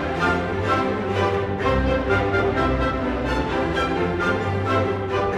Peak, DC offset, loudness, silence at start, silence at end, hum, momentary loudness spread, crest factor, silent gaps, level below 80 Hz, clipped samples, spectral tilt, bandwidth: -8 dBFS; under 0.1%; -22 LUFS; 0 s; 0 s; none; 3 LU; 14 dB; none; -34 dBFS; under 0.1%; -7 dB/octave; 11.5 kHz